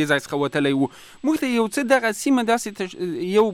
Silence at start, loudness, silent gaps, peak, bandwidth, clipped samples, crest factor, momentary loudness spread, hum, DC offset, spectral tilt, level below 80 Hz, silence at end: 0 s; -22 LUFS; none; -8 dBFS; 16 kHz; under 0.1%; 14 dB; 8 LU; none; under 0.1%; -4.5 dB/octave; -62 dBFS; 0 s